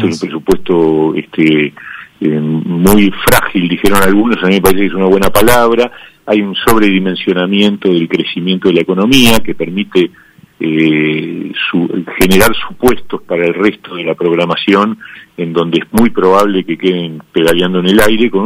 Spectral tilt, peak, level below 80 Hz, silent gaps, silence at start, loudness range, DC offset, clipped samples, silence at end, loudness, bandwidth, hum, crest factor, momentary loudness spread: -5 dB/octave; 0 dBFS; -34 dBFS; none; 0 s; 3 LU; under 0.1%; 0.7%; 0 s; -11 LUFS; over 20 kHz; none; 10 dB; 9 LU